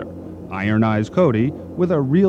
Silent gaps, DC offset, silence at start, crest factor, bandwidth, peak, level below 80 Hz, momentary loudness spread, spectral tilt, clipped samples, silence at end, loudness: none; under 0.1%; 0 s; 14 dB; 8 kHz; -4 dBFS; -52 dBFS; 14 LU; -9 dB/octave; under 0.1%; 0 s; -19 LUFS